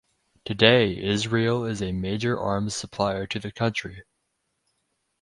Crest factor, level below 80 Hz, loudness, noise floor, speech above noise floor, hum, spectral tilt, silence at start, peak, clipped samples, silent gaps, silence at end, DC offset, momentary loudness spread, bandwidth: 24 dB; -50 dBFS; -24 LUFS; -76 dBFS; 52 dB; none; -5 dB/octave; 0.45 s; 0 dBFS; under 0.1%; none; 1.2 s; under 0.1%; 14 LU; 11.5 kHz